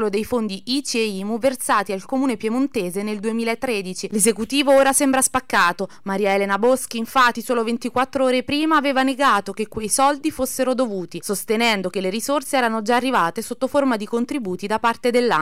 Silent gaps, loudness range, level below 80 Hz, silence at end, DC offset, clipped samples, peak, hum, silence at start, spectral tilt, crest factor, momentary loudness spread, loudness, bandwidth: none; 4 LU; -54 dBFS; 0 s; 0.8%; under 0.1%; -6 dBFS; none; 0 s; -3 dB/octave; 14 dB; 7 LU; -20 LUFS; 16 kHz